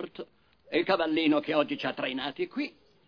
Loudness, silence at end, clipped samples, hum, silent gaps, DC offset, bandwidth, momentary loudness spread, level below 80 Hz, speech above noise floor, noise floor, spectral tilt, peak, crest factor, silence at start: -29 LUFS; 0.35 s; under 0.1%; none; none; under 0.1%; 5.4 kHz; 14 LU; -68 dBFS; 26 dB; -55 dBFS; -6.5 dB/octave; -12 dBFS; 20 dB; 0 s